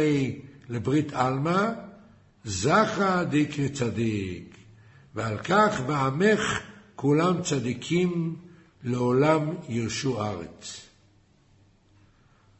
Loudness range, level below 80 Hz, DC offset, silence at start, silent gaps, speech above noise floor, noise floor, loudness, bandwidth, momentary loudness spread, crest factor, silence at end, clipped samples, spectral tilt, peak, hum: 3 LU; -58 dBFS; under 0.1%; 0 s; none; 35 dB; -61 dBFS; -26 LUFS; 8.4 kHz; 17 LU; 18 dB; 1.75 s; under 0.1%; -5.5 dB/octave; -8 dBFS; none